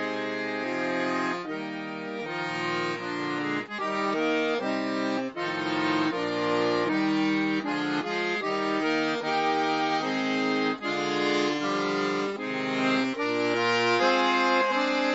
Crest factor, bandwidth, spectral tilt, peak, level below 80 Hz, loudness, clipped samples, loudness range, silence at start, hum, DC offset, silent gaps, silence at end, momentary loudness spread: 16 dB; 8 kHz; -4.5 dB/octave; -12 dBFS; -78 dBFS; -27 LUFS; under 0.1%; 5 LU; 0 s; none; under 0.1%; none; 0 s; 7 LU